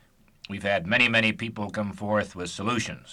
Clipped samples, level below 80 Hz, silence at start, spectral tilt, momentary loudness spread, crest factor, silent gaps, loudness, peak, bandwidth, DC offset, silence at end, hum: under 0.1%; -56 dBFS; 0.5 s; -4.5 dB/octave; 12 LU; 18 dB; none; -25 LUFS; -8 dBFS; 12.5 kHz; under 0.1%; 0 s; none